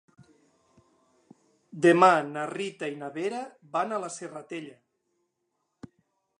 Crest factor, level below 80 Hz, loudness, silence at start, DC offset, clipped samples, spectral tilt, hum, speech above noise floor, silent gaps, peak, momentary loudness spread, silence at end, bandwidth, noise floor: 26 dB; -80 dBFS; -26 LUFS; 1.75 s; under 0.1%; under 0.1%; -5 dB/octave; none; 53 dB; none; -4 dBFS; 20 LU; 1.7 s; 11 kHz; -79 dBFS